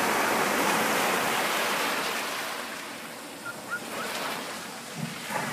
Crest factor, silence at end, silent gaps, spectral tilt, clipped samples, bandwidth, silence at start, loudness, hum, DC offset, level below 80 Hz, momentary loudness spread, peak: 16 dB; 0 s; none; -2 dB/octave; under 0.1%; 15.5 kHz; 0 s; -28 LUFS; none; under 0.1%; -70 dBFS; 13 LU; -12 dBFS